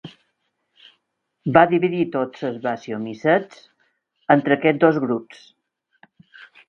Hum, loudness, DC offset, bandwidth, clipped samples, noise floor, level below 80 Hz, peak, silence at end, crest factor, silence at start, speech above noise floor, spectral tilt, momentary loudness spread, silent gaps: none; -20 LUFS; under 0.1%; 7 kHz; under 0.1%; -73 dBFS; -64 dBFS; 0 dBFS; 1.45 s; 22 dB; 0.05 s; 54 dB; -8 dB/octave; 13 LU; none